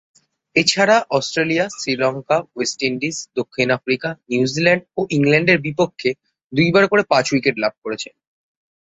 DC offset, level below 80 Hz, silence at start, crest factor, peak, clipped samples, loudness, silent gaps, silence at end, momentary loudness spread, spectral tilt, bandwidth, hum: under 0.1%; -58 dBFS; 0.55 s; 18 dB; -2 dBFS; under 0.1%; -18 LUFS; 6.44-6.50 s, 7.78-7.82 s; 0.95 s; 10 LU; -4.5 dB/octave; 8.4 kHz; none